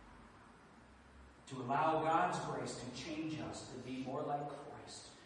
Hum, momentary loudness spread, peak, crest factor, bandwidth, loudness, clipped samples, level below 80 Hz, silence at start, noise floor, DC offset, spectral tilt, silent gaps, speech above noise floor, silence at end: none; 26 LU; -20 dBFS; 20 dB; 11 kHz; -40 LUFS; under 0.1%; -68 dBFS; 0 s; -61 dBFS; under 0.1%; -5 dB/octave; none; 22 dB; 0 s